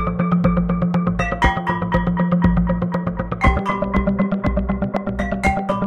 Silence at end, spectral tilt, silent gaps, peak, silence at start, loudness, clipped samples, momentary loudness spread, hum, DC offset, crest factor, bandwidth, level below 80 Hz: 0 s; -8 dB/octave; none; -2 dBFS; 0 s; -19 LUFS; under 0.1%; 5 LU; none; under 0.1%; 16 dB; 9.2 kHz; -26 dBFS